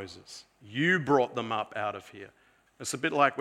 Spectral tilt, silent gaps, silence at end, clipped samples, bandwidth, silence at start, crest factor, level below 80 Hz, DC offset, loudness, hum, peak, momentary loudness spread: -4.5 dB/octave; none; 0 s; under 0.1%; 15.5 kHz; 0 s; 22 dB; -72 dBFS; under 0.1%; -29 LUFS; none; -8 dBFS; 22 LU